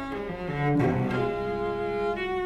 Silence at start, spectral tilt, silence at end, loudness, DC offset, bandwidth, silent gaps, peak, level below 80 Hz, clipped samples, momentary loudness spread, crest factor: 0 s; -8 dB/octave; 0 s; -28 LUFS; under 0.1%; 12 kHz; none; -12 dBFS; -48 dBFS; under 0.1%; 8 LU; 14 dB